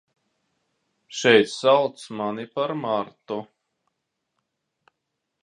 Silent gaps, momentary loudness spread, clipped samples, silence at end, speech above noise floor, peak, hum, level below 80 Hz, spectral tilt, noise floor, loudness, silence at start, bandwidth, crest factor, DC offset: none; 16 LU; under 0.1%; 2 s; 58 dB; -2 dBFS; none; -74 dBFS; -4 dB/octave; -80 dBFS; -23 LUFS; 1.1 s; 10.5 kHz; 24 dB; under 0.1%